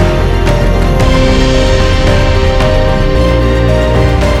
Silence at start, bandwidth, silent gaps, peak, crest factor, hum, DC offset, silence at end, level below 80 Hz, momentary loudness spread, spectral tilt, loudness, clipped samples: 0 s; 12.5 kHz; none; 0 dBFS; 8 dB; none; under 0.1%; 0 s; -12 dBFS; 2 LU; -6 dB/octave; -10 LUFS; under 0.1%